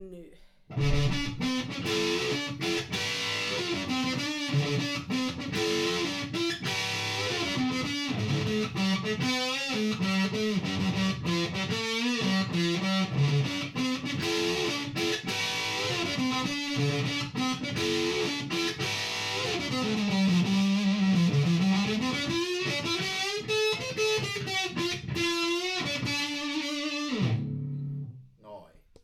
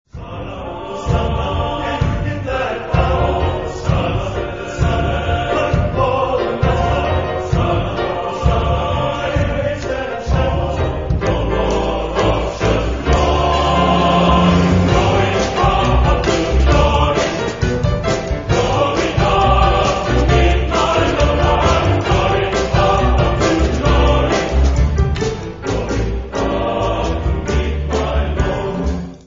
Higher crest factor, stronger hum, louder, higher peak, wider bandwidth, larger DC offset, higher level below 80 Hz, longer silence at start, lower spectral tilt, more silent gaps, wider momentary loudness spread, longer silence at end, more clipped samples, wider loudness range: about the same, 16 dB vs 14 dB; neither; second, -28 LUFS vs -16 LUFS; second, -14 dBFS vs 0 dBFS; first, 15 kHz vs 7.6 kHz; second, under 0.1% vs 0.5%; second, -50 dBFS vs -22 dBFS; second, 0 s vs 0.15 s; second, -4.5 dB/octave vs -6 dB/octave; neither; about the same, 5 LU vs 7 LU; first, 0.4 s vs 0.05 s; neither; about the same, 3 LU vs 5 LU